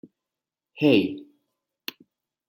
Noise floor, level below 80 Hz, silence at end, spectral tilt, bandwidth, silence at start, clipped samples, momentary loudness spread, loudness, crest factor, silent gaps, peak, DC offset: -88 dBFS; -72 dBFS; 1.25 s; -6.5 dB/octave; 16 kHz; 0.75 s; under 0.1%; 18 LU; -22 LUFS; 22 dB; none; -6 dBFS; under 0.1%